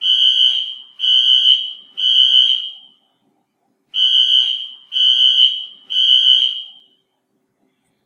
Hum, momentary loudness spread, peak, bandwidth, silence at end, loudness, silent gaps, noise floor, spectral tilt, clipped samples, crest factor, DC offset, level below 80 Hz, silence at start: none; 14 LU; 0 dBFS; 10 kHz; 1.35 s; -11 LUFS; none; -67 dBFS; 4 dB/octave; under 0.1%; 16 dB; under 0.1%; -78 dBFS; 0 s